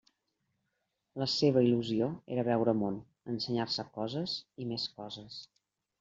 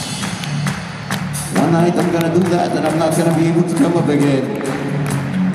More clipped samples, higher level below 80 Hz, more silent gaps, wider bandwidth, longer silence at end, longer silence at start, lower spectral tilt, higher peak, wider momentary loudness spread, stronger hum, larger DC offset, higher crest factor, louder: neither; second, -70 dBFS vs -46 dBFS; neither; second, 7.8 kHz vs 15 kHz; first, 0.55 s vs 0 s; first, 1.15 s vs 0 s; about the same, -6.5 dB/octave vs -6 dB/octave; second, -14 dBFS vs -2 dBFS; first, 16 LU vs 8 LU; neither; neither; first, 20 dB vs 14 dB; second, -32 LUFS vs -17 LUFS